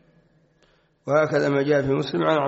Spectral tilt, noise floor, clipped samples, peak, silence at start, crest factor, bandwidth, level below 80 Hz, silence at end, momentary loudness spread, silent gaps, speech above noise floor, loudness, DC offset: -5 dB/octave; -62 dBFS; under 0.1%; -8 dBFS; 1.05 s; 16 dB; 8 kHz; -58 dBFS; 0 s; 4 LU; none; 41 dB; -22 LUFS; under 0.1%